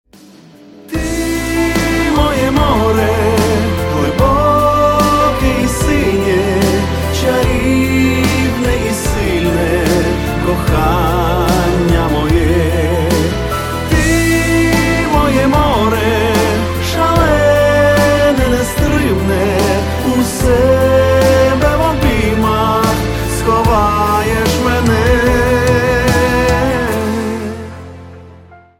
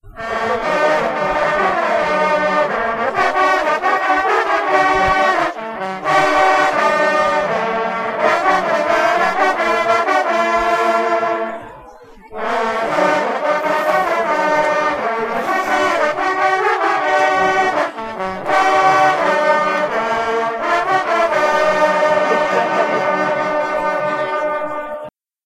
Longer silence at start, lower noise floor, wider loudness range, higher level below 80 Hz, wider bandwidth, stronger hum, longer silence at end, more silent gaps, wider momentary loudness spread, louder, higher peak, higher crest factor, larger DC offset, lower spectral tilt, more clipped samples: first, 0.85 s vs 0.05 s; about the same, -40 dBFS vs -40 dBFS; about the same, 2 LU vs 3 LU; first, -22 dBFS vs -48 dBFS; first, 17 kHz vs 15 kHz; neither; about the same, 0.25 s vs 0.35 s; neither; about the same, 6 LU vs 6 LU; first, -13 LUFS vs -16 LUFS; about the same, 0 dBFS vs 0 dBFS; about the same, 12 dB vs 16 dB; neither; first, -5.5 dB/octave vs -4 dB/octave; neither